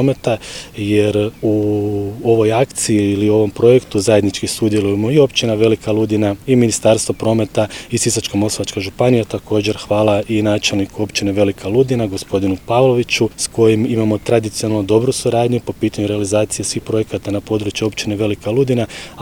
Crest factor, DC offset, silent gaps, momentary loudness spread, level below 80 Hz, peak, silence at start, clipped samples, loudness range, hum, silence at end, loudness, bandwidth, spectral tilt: 16 dB; under 0.1%; none; 6 LU; -44 dBFS; 0 dBFS; 0 s; under 0.1%; 3 LU; none; 0 s; -16 LUFS; 19.5 kHz; -5 dB/octave